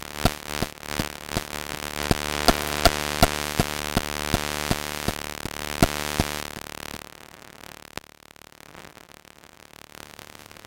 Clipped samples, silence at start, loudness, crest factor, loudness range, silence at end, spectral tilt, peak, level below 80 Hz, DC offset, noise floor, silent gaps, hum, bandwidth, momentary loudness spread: under 0.1%; 0 s; -26 LUFS; 28 dB; 19 LU; 0 s; -3.5 dB/octave; 0 dBFS; -38 dBFS; under 0.1%; -50 dBFS; none; none; 17 kHz; 23 LU